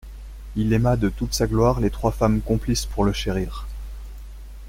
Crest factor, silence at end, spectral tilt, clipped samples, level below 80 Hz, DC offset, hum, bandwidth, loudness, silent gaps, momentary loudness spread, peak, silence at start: 18 dB; 0 s; -6 dB/octave; under 0.1%; -32 dBFS; under 0.1%; none; 16.5 kHz; -22 LUFS; none; 21 LU; -6 dBFS; 0.05 s